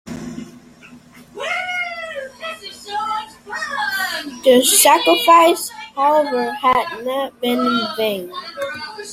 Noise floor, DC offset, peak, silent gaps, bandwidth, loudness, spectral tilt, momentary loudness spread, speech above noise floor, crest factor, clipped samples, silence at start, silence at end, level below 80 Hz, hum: -43 dBFS; under 0.1%; 0 dBFS; none; 16.5 kHz; -17 LUFS; -1.5 dB/octave; 18 LU; 28 dB; 18 dB; under 0.1%; 0.05 s; 0 s; -58 dBFS; none